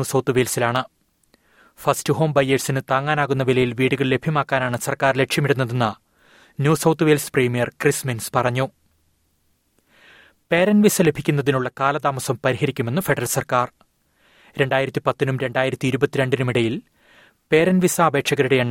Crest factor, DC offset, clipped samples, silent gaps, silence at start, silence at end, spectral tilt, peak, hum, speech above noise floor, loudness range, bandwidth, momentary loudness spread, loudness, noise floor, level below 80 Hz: 18 dB; under 0.1%; under 0.1%; none; 0 s; 0 s; -5 dB/octave; -2 dBFS; none; 46 dB; 3 LU; 17 kHz; 6 LU; -20 LUFS; -65 dBFS; -56 dBFS